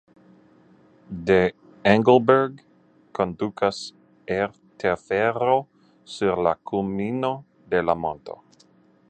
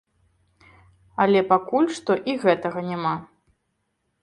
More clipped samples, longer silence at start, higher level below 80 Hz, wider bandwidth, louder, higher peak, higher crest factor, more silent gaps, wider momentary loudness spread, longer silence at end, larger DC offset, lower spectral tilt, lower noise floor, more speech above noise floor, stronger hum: neither; about the same, 1.1 s vs 1.2 s; first, -54 dBFS vs -64 dBFS; second, 9.2 kHz vs 11 kHz; about the same, -23 LUFS vs -22 LUFS; first, 0 dBFS vs -4 dBFS; about the same, 24 dB vs 22 dB; neither; first, 18 LU vs 8 LU; second, 0.75 s vs 0.95 s; neither; about the same, -6.5 dB/octave vs -6 dB/octave; second, -57 dBFS vs -74 dBFS; second, 36 dB vs 53 dB; neither